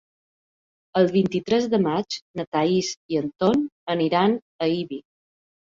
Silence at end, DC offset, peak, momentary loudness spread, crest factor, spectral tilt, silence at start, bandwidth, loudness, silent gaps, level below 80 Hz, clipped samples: 0.8 s; under 0.1%; -6 dBFS; 8 LU; 18 dB; -6 dB/octave; 0.95 s; 7.8 kHz; -23 LUFS; 2.22-2.34 s, 2.47-2.52 s, 2.97-3.09 s, 3.72-3.87 s, 4.42-4.59 s; -62 dBFS; under 0.1%